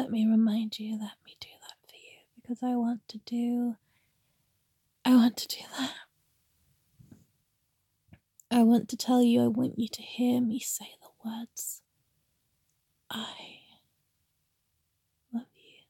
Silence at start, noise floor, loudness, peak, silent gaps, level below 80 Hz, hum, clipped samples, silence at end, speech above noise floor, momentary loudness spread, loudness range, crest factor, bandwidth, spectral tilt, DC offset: 0 s; -78 dBFS; -29 LUFS; -12 dBFS; none; -78 dBFS; none; under 0.1%; 0.45 s; 50 dB; 23 LU; 16 LU; 20 dB; 17 kHz; -4.5 dB/octave; under 0.1%